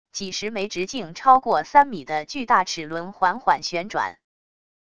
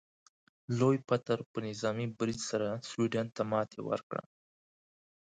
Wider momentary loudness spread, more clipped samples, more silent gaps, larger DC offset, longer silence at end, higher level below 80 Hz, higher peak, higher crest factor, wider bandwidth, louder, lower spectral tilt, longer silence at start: first, 11 LU vs 8 LU; neither; second, none vs 1.46-1.54 s, 4.03-4.10 s; first, 0.4% vs under 0.1%; second, 0.8 s vs 1.2 s; first, -60 dBFS vs -72 dBFS; first, -2 dBFS vs -14 dBFS; about the same, 20 dB vs 20 dB; about the same, 10 kHz vs 9.4 kHz; first, -22 LUFS vs -34 LUFS; second, -3 dB/octave vs -6 dB/octave; second, 0.15 s vs 0.7 s